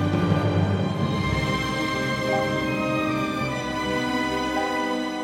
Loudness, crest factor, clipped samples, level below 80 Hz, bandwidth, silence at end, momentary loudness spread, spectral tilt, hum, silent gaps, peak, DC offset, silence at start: -24 LUFS; 16 dB; under 0.1%; -44 dBFS; 16.5 kHz; 0 s; 4 LU; -6 dB/octave; none; none; -8 dBFS; under 0.1%; 0 s